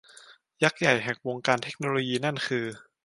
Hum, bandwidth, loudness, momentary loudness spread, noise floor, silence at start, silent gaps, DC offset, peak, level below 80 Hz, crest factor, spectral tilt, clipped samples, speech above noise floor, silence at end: none; 11.5 kHz; -27 LUFS; 7 LU; -54 dBFS; 0.3 s; none; under 0.1%; -6 dBFS; -70 dBFS; 24 dB; -4.5 dB/octave; under 0.1%; 27 dB; 0.25 s